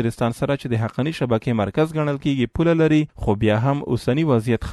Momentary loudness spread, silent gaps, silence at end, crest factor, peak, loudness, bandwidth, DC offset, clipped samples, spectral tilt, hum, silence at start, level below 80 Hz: 5 LU; none; 0 s; 14 dB; -6 dBFS; -21 LUFS; 12.5 kHz; under 0.1%; under 0.1%; -7.5 dB/octave; none; 0 s; -42 dBFS